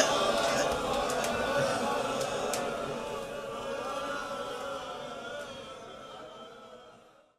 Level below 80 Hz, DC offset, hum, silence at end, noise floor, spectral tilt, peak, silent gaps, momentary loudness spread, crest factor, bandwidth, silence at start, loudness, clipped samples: -58 dBFS; under 0.1%; none; 0.3 s; -57 dBFS; -3 dB/octave; -10 dBFS; none; 18 LU; 24 dB; 15.5 kHz; 0 s; -32 LUFS; under 0.1%